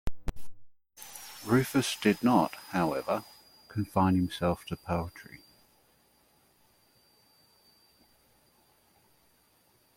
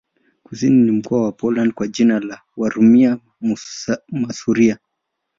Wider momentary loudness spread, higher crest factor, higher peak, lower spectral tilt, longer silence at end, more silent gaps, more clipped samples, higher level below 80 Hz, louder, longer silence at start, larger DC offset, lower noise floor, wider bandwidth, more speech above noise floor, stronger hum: first, 21 LU vs 11 LU; first, 22 dB vs 14 dB; second, -10 dBFS vs -2 dBFS; about the same, -5.5 dB/octave vs -6.5 dB/octave; first, 4.75 s vs 0.65 s; neither; neither; first, -50 dBFS vs -58 dBFS; second, -30 LUFS vs -17 LUFS; second, 0.05 s vs 0.5 s; neither; second, -67 dBFS vs -76 dBFS; first, 16.5 kHz vs 7.6 kHz; second, 38 dB vs 60 dB; neither